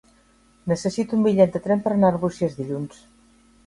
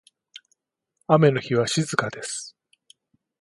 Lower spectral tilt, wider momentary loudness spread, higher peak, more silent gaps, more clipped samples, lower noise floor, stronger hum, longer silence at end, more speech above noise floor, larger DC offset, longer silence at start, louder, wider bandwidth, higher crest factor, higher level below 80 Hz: first, -7.5 dB/octave vs -5 dB/octave; second, 12 LU vs 18 LU; about the same, -4 dBFS vs -4 dBFS; neither; neither; second, -57 dBFS vs -74 dBFS; neither; second, 0.8 s vs 0.95 s; second, 36 dB vs 52 dB; neither; second, 0.65 s vs 1.1 s; about the same, -22 LUFS vs -22 LUFS; about the same, 11.5 kHz vs 11.5 kHz; about the same, 20 dB vs 22 dB; first, -56 dBFS vs -66 dBFS